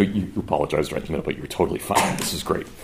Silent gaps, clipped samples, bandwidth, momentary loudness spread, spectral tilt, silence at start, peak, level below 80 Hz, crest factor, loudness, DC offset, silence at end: none; under 0.1%; 16 kHz; 6 LU; -4.5 dB/octave; 0 s; -4 dBFS; -44 dBFS; 20 dB; -24 LUFS; under 0.1%; 0 s